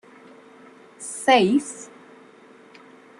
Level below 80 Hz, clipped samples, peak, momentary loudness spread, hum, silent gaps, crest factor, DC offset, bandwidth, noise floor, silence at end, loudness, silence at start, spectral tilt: -72 dBFS; under 0.1%; -4 dBFS; 22 LU; none; none; 20 dB; under 0.1%; 12.5 kHz; -50 dBFS; 1.35 s; -20 LUFS; 1 s; -4 dB/octave